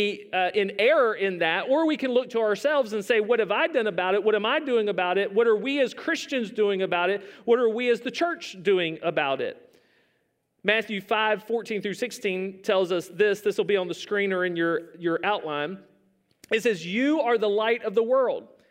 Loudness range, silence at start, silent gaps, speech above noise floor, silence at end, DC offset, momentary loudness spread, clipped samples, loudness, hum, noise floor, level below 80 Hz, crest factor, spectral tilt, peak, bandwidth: 4 LU; 0 s; none; 48 dB; 0.25 s; under 0.1%; 7 LU; under 0.1%; -25 LUFS; none; -72 dBFS; -80 dBFS; 18 dB; -4.5 dB/octave; -6 dBFS; 16 kHz